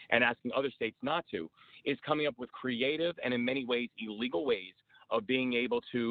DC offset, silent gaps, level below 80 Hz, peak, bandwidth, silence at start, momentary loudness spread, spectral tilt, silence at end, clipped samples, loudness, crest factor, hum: under 0.1%; none; -72 dBFS; -10 dBFS; 4.7 kHz; 0 s; 9 LU; -7.5 dB/octave; 0 s; under 0.1%; -33 LUFS; 24 dB; none